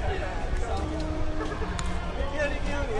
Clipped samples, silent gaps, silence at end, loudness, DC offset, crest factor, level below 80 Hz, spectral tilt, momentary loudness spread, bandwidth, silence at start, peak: under 0.1%; none; 0 s; -31 LUFS; under 0.1%; 18 dB; -32 dBFS; -5.5 dB/octave; 3 LU; 11 kHz; 0 s; -10 dBFS